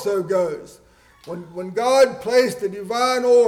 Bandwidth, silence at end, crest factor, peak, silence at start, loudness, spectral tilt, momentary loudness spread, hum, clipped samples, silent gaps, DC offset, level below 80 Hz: 15.5 kHz; 0 s; 14 dB; -6 dBFS; 0 s; -19 LUFS; -4 dB/octave; 17 LU; none; under 0.1%; none; under 0.1%; -60 dBFS